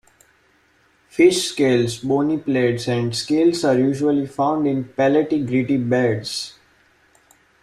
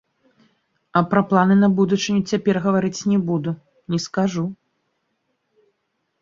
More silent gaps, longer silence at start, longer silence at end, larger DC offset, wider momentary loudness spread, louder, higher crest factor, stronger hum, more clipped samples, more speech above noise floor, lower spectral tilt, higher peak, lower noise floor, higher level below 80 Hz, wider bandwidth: neither; first, 1.15 s vs 0.95 s; second, 1.15 s vs 1.7 s; neither; second, 6 LU vs 11 LU; about the same, -19 LUFS vs -20 LUFS; about the same, 16 dB vs 20 dB; neither; neither; second, 40 dB vs 54 dB; about the same, -5.5 dB/octave vs -6.5 dB/octave; about the same, -4 dBFS vs -2 dBFS; second, -59 dBFS vs -73 dBFS; about the same, -58 dBFS vs -60 dBFS; first, 14 kHz vs 7.6 kHz